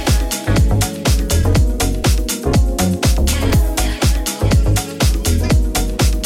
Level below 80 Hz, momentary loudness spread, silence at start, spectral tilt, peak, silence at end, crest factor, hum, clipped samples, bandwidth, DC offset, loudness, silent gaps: -18 dBFS; 3 LU; 0 s; -5 dB/octave; -4 dBFS; 0 s; 10 dB; none; under 0.1%; 16.5 kHz; under 0.1%; -16 LUFS; none